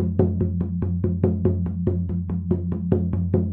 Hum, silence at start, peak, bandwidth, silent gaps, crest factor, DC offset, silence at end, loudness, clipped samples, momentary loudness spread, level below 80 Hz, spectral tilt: none; 0 s; -2 dBFS; 2.8 kHz; none; 20 dB; under 0.1%; 0 s; -24 LUFS; under 0.1%; 4 LU; -38 dBFS; -13.5 dB/octave